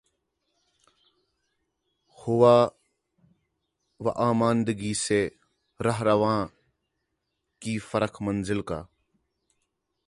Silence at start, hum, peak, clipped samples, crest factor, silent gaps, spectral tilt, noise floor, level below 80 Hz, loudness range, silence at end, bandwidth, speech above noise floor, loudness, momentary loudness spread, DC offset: 2.2 s; none; -6 dBFS; under 0.1%; 22 dB; none; -5.5 dB/octave; -80 dBFS; -58 dBFS; 7 LU; 1.2 s; 11.5 kHz; 56 dB; -25 LUFS; 14 LU; under 0.1%